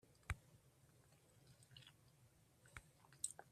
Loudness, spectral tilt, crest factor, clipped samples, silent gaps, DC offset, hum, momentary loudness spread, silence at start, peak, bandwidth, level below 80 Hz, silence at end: -54 LUFS; -2 dB/octave; 32 dB; under 0.1%; none; under 0.1%; none; 18 LU; 0.05 s; -26 dBFS; 14 kHz; -68 dBFS; 0 s